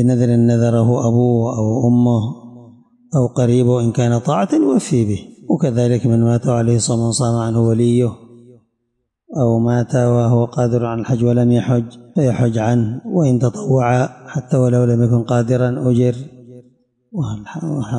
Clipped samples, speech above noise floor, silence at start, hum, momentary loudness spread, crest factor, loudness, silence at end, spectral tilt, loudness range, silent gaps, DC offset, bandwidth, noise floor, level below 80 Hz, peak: under 0.1%; 57 dB; 0 s; none; 8 LU; 10 dB; -16 LUFS; 0 s; -7.5 dB/octave; 2 LU; none; under 0.1%; 10.5 kHz; -72 dBFS; -52 dBFS; -4 dBFS